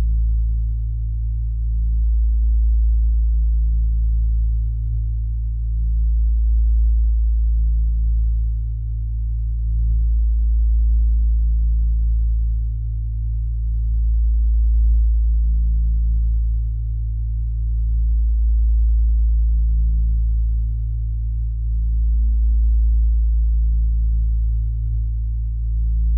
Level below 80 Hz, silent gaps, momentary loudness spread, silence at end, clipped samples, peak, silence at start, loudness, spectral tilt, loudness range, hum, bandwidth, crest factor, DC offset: -18 dBFS; none; 6 LU; 0 s; under 0.1%; -10 dBFS; 0 s; -21 LUFS; -15 dB/octave; 2 LU; none; 0.4 kHz; 8 dB; under 0.1%